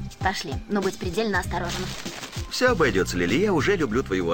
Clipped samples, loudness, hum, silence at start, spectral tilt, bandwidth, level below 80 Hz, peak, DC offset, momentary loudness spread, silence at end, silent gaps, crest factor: under 0.1%; -24 LUFS; none; 0 s; -5 dB/octave; 17 kHz; -40 dBFS; -8 dBFS; 0.7%; 9 LU; 0 s; none; 16 dB